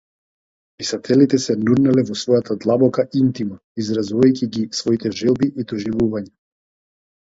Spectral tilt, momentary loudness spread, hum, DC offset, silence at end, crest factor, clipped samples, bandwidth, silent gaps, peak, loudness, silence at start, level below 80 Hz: -6 dB/octave; 11 LU; none; under 0.1%; 1.1 s; 18 dB; under 0.1%; 7.8 kHz; 3.64-3.75 s; -2 dBFS; -19 LUFS; 0.8 s; -54 dBFS